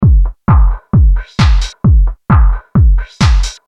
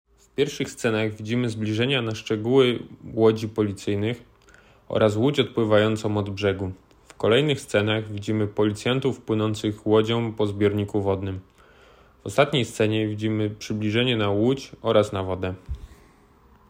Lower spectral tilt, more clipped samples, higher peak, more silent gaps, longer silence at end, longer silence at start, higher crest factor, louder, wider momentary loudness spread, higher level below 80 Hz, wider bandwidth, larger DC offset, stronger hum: about the same, -6.5 dB/octave vs -6 dB/octave; neither; first, 0 dBFS vs -4 dBFS; neither; second, 0.15 s vs 0.8 s; second, 0 s vs 0.4 s; second, 8 dB vs 20 dB; first, -12 LUFS vs -24 LUFS; second, 2 LU vs 9 LU; first, -10 dBFS vs -52 dBFS; second, 8.4 kHz vs 16 kHz; neither; neither